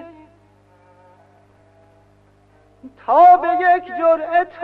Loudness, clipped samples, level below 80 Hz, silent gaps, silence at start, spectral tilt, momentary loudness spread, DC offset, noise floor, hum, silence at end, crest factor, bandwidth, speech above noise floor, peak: -14 LUFS; under 0.1%; -62 dBFS; none; 0 s; -6 dB/octave; 8 LU; under 0.1%; -54 dBFS; 50 Hz at -55 dBFS; 0 s; 16 dB; 4.5 kHz; 39 dB; -2 dBFS